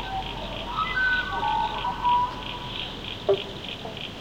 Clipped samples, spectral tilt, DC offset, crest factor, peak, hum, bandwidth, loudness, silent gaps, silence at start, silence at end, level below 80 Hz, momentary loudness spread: under 0.1%; -4.5 dB/octave; 0.1%; 18 dB; -10 dBFS; none; 16.5 kHz; -27 LUFS; none; 0 s; 0 s; -44 dBFS; 10 LU